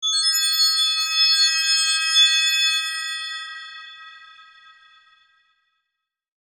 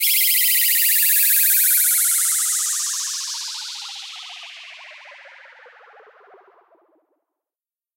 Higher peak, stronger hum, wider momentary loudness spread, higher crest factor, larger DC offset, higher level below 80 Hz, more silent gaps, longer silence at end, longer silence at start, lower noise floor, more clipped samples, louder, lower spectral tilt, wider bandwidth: about the same, -6 dBFS vs -4 dBFS; neither; about the same, 19 LU vs 21 LU; about the same, 16 dB vs 18 dB; neither; first, -82 dBFS vs under -90 dBFS; neither; second, 2.25 s vs 2.7 s; about the same, 0 s vs 0 s; second, -82 dBFS vs under -90 dBFS; neither; about the same, -17 LUFS vs -15 LUFS; about the same, 9 dB/octave vs 8.5 dB/octave; about the same, 17 kHz vs 16.5 kHz